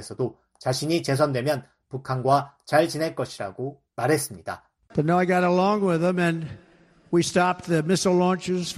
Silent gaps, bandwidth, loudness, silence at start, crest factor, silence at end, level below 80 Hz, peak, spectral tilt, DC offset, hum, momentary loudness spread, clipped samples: none; 13.5 kHz; -24 LUFS; 0 s; 18 dB; 0 s; -60 dBFS; -6 dBFS; -5.5 dB/octave; under 0.1%; none; 12 LU; under 0.1%